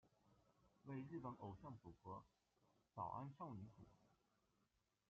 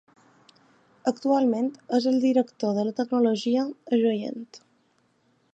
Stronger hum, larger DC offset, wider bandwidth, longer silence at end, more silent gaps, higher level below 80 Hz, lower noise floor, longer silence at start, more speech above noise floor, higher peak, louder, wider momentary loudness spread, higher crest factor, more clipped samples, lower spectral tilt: neither; neither; second, 7 kHz vs 8 kHz; about the same, 0.95 s vs 0.95 s; neither; about the same, -82 dBFS vs -82 dBFS; first, -87 dBFS vs -67 dBFS; second, 0.05 s vs 1.05 s; second, 32 dB vs 43 dB; second, -38 dBFS vs -8 dBFS; second, -56 LUFS vs -25 LUFS; about the same, 10 LU vs 8 LU; about the same, 20 dB vs 18 dB; neither; first, -8.5 dB/octave vs -6 dB/octave